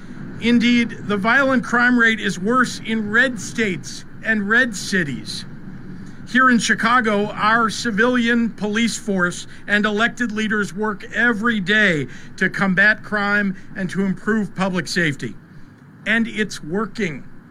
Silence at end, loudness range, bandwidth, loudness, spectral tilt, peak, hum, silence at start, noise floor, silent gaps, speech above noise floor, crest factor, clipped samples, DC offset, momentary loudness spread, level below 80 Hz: 0 s; 5 LU; 13.5 kHz; -18 LUFS; -4.5 dB/octave; -4 dBFS; none; 0 s; -41 dBFS; none; 22 dB; 14 dB; under 0.1%; under 0.1%; 13 LU; -42 dBFS